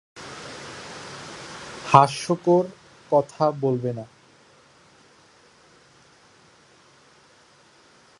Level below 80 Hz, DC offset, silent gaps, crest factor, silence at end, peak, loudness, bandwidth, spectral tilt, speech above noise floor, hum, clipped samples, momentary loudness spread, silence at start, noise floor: -66 dBFS; under 0.1%; none; 26 dB; 4.15 s; 0 dBFS; -21 LUFS; 11.5 kHz; -6 dB/octave; 35 dB; none; under 0.1%; 21 LU; 0.15 s; -55 dBFS